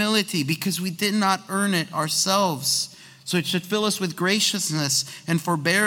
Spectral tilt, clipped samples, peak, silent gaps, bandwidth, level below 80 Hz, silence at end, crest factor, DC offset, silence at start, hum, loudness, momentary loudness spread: -3 dB/octave; under 0.1%; -6 dBFS; none; 18 kHz; -68 dBFS; 0 s; 18 dB; under 0.1%; 0 s; none; -22 LUFS; 5 LU